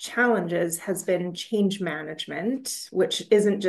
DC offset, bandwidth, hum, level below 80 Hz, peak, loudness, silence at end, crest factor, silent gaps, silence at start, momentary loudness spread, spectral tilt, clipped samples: under 0.1%; 12.5 kHz; none; -74 dBFS; -8 dBFS; -26 LUFS; 0 s; 18 dB; none; 0 s; 9 LU; -4 dB/octave; under 0.1%